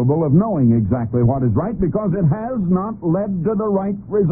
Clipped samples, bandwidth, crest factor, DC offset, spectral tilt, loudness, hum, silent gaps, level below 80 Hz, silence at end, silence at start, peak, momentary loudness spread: under 0.1%; 2.5 kHz; 14 dB; under 0.1%; -16.5 dB/octave; -18 LUFS; none; none; -38 dBFS; 0 s; 0 s; -4 dBFS; 5 LU